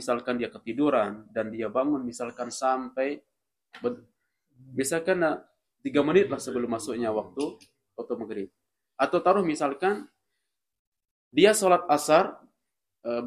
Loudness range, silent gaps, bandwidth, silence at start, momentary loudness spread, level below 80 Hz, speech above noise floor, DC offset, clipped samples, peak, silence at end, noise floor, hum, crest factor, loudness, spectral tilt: 6 LU; 10.79-10.92 s, 11.11-11.31 s; 15 kHz; 0 s; 14 LU; -70 dBFS; 58 dB; under 0.1%; under 0.1%; -4 dBFS; 0 s; -84 dBFS; none; 22 dB; -27 LUFS; -4.5 dB/octave